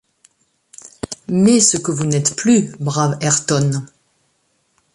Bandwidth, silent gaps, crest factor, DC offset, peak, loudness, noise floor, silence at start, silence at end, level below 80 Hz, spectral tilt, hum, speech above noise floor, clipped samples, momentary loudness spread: 11.5 kHz; none; 18 dB; under 0.1%; -2 dBFS; -16 LUFS; -64 dBFS; 0.85 s; 1.1 s; -54 dBFS; -4.5 dB/octave; none; 49 dB; under 0.1%; 14 LU